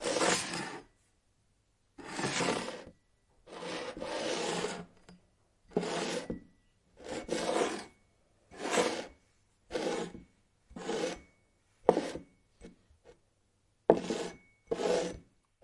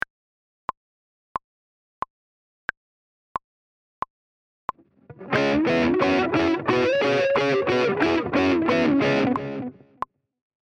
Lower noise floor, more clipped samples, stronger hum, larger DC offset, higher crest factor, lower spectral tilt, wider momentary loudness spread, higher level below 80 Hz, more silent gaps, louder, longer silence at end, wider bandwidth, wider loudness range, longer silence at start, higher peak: first, -73 dBFS vs -49 dBFS; neither; neither; neither; first, 32 dB vs 18 dB; second, -3.5 dB/octave vs -6 dB/octave; first, 19 LU vs 16 LU; second, -64 dBFS vs -56 dBFS; neither; second, -35 LUFS vs -21 LUFS; second, 0.4 s vs 1 s; first, 11.5 kHz vs 9 kHz; second, 4 LU vs 17 LU; second, 0 s vs 5.1 s; first, -4 dBFS vs -8 dBFS